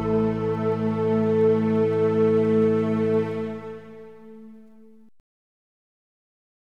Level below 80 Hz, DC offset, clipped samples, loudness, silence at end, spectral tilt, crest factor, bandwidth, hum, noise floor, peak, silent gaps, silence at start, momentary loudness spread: -56 dBFS; 0.3%; under 0.1%; -22 LUFS; 2.05 s; -9.5 dB/octave; 14 dB; 6.2 kHz; none; -52 dBFS; -10 dBFS; none; 0 s; 13 LU